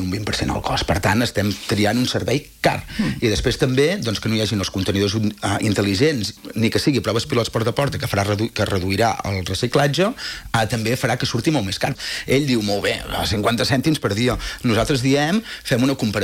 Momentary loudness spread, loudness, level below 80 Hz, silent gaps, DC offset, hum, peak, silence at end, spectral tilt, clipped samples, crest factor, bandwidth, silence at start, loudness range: 5 LU; -20 LUFS; -40 dBFS; none; under 0.1%; none; -4 dBFS; 0 s; -5 dB/octave; under 0.1%; 16 dB; 17 kHz; 0 s; 1 LU